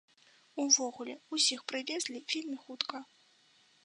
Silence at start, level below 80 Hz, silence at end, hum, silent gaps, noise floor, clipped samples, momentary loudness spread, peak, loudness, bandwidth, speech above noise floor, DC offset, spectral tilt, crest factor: 0.55 s; under -90 dBFS; 0.8 s; none; none; -67 dBFS; under 0.1%; 16 LU; -10 dBFS; -32 LUFS; 10.5 kHz; 32 dB; under 0.1%; 1 dB/octave; 26 dB